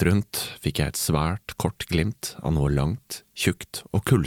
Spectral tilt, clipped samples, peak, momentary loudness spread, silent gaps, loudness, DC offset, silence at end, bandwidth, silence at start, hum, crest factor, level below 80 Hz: -5 dB/octave; under 0.1%; -6 dBFS; 7 LU; none; -26 LUFS; under 0.1%; 0 s; 17.5 kHz; 0 s; none; 18 dB; -38 dBFS